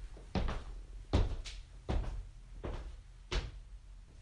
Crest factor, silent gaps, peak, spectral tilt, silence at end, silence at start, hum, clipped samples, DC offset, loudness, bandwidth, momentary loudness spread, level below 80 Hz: 20 dB; none; -18 dBFS; -6 dB/octave; 0 s; 0 s; none; under 0.1%; under 0.1%; -41 LUFS; 10.5 kHz; 19 LU; -40 dBFS